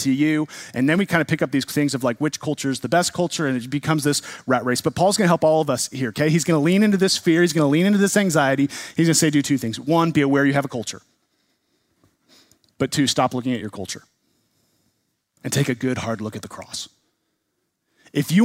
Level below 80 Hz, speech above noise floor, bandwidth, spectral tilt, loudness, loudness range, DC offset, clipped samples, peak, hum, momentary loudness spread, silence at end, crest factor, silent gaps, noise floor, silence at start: -60 dBFS; 54 dB; 16 kHz; -5 dB/octave; -20 LUFS; 10 LU; under 0.1%; under 0.1%; -2 dBFS; none; 12 LU; 0 s; 20 dB; none; -74 dBFS; 0 s